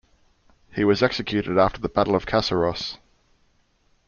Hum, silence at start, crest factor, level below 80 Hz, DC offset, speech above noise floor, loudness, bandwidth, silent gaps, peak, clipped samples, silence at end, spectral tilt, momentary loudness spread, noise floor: none; 0.75 s; 20 dB; -48 dBFS; under 0.1%; 42 dB; -22 LUFS; 7.2 kHz; none; -4 dBFS; under 0.1%; 1.1 s; -6 dB/octave; 12 LU; -64 dBFS